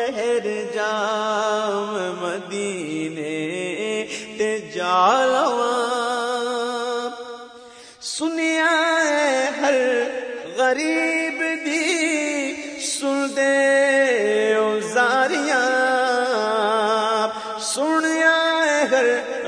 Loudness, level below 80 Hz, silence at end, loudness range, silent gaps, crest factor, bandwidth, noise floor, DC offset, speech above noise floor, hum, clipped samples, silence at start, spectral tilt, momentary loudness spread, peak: -20 LUFS; -72 dBFS; 0 s; 6 LU; none; 16 dB; 10.5 kHz; -43 dBFS; under 0.1%; 20 dB; none; under 0.1%; 0 s; -2.5 dB/octave; 10 LU; -4 dBFS